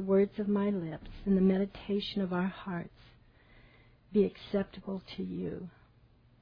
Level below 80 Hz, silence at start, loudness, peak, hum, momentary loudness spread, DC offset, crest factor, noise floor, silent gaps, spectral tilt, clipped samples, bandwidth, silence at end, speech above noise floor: -56 dBFS; 0 s; -33 LUFS; -16 dBFS; none; 13 LU; under 0.1%; 16 dB; -63 dBFS; none; -9.5 dB/octave; under 0.1%; 5.2 kHz; 0.75 s; 31 dB